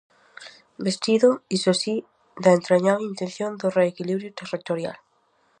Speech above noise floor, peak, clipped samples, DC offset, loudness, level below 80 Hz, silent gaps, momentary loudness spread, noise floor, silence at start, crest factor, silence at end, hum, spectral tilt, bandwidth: 43 dB; -4 dBFS; under 0.1%; under 0.1%; -23 LUFS; -74 dBFS; none; 14 LU; -65 dBFS; 0.4 s; 20 dB; 0.65 s; none; -5 dB/octave; 10.5 kHz